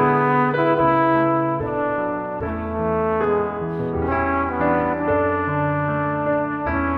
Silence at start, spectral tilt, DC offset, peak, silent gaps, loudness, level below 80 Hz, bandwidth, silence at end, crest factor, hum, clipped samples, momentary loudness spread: 0 s; -10 dB/octave; under 0.1%; -4 dBFS; none; -21 LUFS; -40 dBFS; 5.4 kHz; 0 s; 16 dB; none; under 0.1%; 8 LU